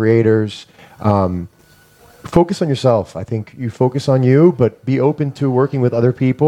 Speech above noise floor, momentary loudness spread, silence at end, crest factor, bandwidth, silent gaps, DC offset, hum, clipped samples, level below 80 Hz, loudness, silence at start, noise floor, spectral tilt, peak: 34 dB; 12 LU; 0 s; 16 dB; 10.5 kHz; none; under 0.1%; none; under 0.1%; -46 dBFS; -16 LUFS; 0 s; -48 dBFS; -8 dB/octave; 0 dBFS